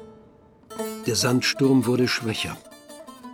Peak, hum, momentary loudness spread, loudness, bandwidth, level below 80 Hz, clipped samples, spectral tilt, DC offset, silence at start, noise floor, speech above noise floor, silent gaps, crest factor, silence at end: -8 dBFS; none; 23 LU; -23 LUFS; 18 kHz; -60 dBFS; under 0.1%; -4.5 dB/octave; under 0.1%; 0 s; -52 dBFS; 31 dB; none; 16 dB; 0 s